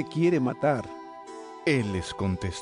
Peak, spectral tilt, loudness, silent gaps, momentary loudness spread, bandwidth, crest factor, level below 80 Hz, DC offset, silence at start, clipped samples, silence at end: -12 dBFS; -6.5 dB/octave; -27 LUFS; none; 18 LU; 10.5 kHz; 16 dB; -54 dBFS; under 0.1%; 0 s; under 0.1%; 0 s